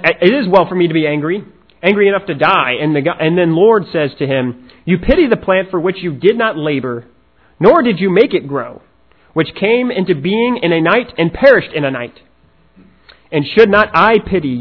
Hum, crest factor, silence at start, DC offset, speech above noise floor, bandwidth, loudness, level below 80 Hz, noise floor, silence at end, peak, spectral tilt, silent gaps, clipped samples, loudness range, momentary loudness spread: none; 14 dB; 0 s; 0.2%; 37 dB; 5.4 kHz; -13 LUFS; -38 dBFS; -50 dBFS; 0 s; 0 dBFS; -8.5 dB/octave; none; 0.4%; 2 LU; 10 LU